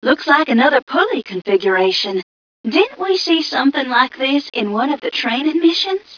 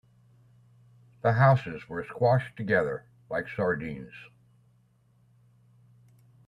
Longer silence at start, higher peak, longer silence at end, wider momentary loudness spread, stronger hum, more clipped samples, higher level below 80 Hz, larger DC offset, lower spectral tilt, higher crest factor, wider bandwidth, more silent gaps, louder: second, 0 s vs 1.25 s; first, 0 dBFS vs -8 dBFS; second, 0 s vs 2.25 s; second, 5 LU vs 17 LU; neither; neither; about the same, -66 dBFS vs -64 dBFS; neither; second, -4 dB/octave vs -9 dB/octave; second, 16 dB vs 22 dB; about the same, 5.4 kHz vs 5.6 kHz; first, 0.82-0.87 s, 2.23-2.64 s vs none; first, -16 LUFS vs -27 LUFS